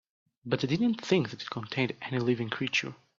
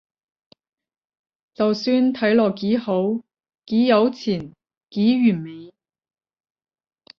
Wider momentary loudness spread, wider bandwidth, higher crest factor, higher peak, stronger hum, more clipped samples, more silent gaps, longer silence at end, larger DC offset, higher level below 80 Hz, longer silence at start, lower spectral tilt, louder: second, 7 LU vs 13 LU; first, 7.6 kHz vs 6.6 kHz; about the same, 20 dB vs 18 dB; second, -10 dBFS vs -4 dBFS; neither; neither; second, none vs 4.77-4.81 s; second, 0.25 s vs 1.55 s; neither; about the same, -68 dBFS vs -64 dBFS; second, 0.45 s vs 1.6 s; second, -5.5 dB/octave vs -7 dB/octave; second, -30 LUFS vs -20 LUFS